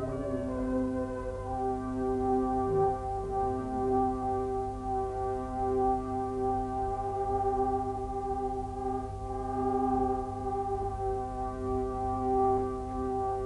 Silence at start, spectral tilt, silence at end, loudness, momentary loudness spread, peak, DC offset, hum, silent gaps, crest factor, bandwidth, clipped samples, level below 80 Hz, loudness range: 0 s; -8.5 dB/octave; 0 s; -32 LUFS; 6 LU; -18 dBFS; under 0.1%; 50 Hz at -45 dBFS; none; 14 dB; 11 kHz; under 0.1%; -44 dBFS; 2 LU